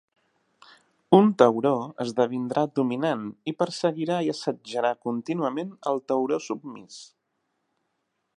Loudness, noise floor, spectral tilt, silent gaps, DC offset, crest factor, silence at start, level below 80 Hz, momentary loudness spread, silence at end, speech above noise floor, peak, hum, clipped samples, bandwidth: -25 LUFS; -77 dBFS; -6.5 dB/octave; none; under 0.1%; 24 dB; 1.1 s; -78 dBFS; 14 LU; 1.35 s; 52 dB; -2 dBFS; none; under 0.1%; 11 kHz